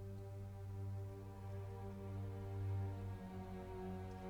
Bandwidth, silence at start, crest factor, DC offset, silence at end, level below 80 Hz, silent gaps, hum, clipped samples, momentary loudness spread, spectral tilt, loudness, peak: 10 kHz; 0 s; 12 dB; under 0.1%; 0 s; -60 dBFS; none; none; under 0.1%; 7 LU; -8.5 dB/octave; -49 LUFS; -34 dBFS